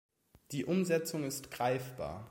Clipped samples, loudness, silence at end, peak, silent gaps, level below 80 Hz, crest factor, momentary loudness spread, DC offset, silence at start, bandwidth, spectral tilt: under 0.1%; -36 LUFS; 0 s; -18 dBFS; none; -64 dBFS; 18 dB; 11 LU; under 0.1%; 0.5 s; 16.5 kHz; -5 dB/octave